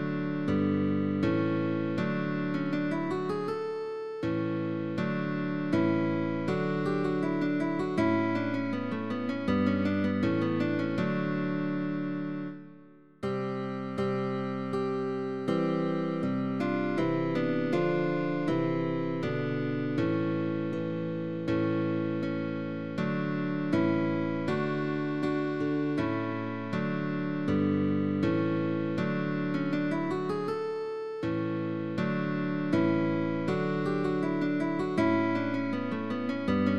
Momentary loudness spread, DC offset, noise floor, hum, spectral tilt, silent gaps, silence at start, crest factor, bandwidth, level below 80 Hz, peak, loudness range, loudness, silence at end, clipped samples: 6 LU; 0.3%; -54 dBFS; none; -8.5 dB/octave; none; 0 s; 14 dB; 8.6 kHz; -62 dBFS; -16 dBFS; 3 LU; -30 LUFS; 0 s; under 0.1%